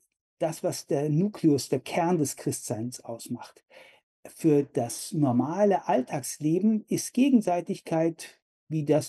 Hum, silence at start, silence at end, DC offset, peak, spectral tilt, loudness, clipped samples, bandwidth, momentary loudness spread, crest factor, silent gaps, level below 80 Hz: none; 0.4 s; 0 s; under 0.1%; -10 dBFS; -6 dB/octave; -27 LUFS; under 0.1%; 13 kHz; 11 LU; 16 dB; 4.03-4.23 s, 8.42-8.67 s; -74 dBFS